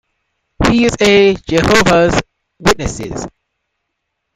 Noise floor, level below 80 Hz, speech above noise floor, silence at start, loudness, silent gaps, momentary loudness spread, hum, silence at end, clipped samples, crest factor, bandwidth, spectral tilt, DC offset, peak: -73 dBFS; -32 dBFS; 61 dB; 0.6 s; -12 LUFS; none; 15 LU; none; 1.05 s; under 0.1%; 14 dB; 16 kHz; -4.5 dB/octave; under 0.1%; 0 dBFS